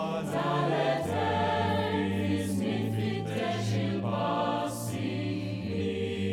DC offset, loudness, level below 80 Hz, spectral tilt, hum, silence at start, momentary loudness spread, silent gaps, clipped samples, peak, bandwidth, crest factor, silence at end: under 0.1%; -30 LUFS; -62 dBFS; -6 dB/octave; none; 0 s; 5 LU; none; under 0.1%; -14 dBFS; 16.5 kHz; 14 dB; 0 s